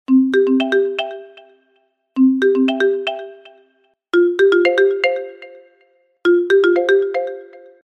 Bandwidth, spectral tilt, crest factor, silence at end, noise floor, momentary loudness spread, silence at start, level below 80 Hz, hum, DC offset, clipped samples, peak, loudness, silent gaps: 8.2 kHz; -4.5 dB/octave; 16 dB; 0.35 s; -63 dBFS; 15 LU; 0.1 s; -70 dBFS; none; under 0.1%; under 0.1%; -2 dBFS; -16 LUFS; none